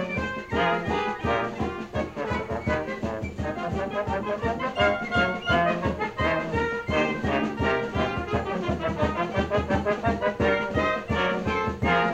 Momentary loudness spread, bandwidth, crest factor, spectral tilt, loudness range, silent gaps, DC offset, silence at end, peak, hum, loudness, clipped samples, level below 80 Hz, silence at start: 6 LU; 13 kHz; 16 dB; -6.5 dB/octave; 4 LU; none; under 0.1%; 0 s; -10 dBFS; none; -26 LUFS; under 0.1%; -42 dBFS; 0 s